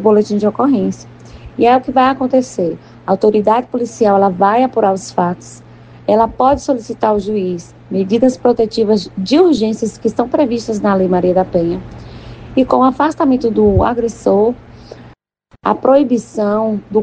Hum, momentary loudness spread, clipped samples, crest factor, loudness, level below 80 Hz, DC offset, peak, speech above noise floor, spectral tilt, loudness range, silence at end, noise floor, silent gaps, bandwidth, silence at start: none; 10 LU; under 0.1%; 14 dB; -14 LUFS; -40 dBFS; under 0.1%; 0 dBFS; 38 dB; -6.5 dB/octave; 2 LU; 0 s; -51 dBFS; none; 9.4 kHz; 0 s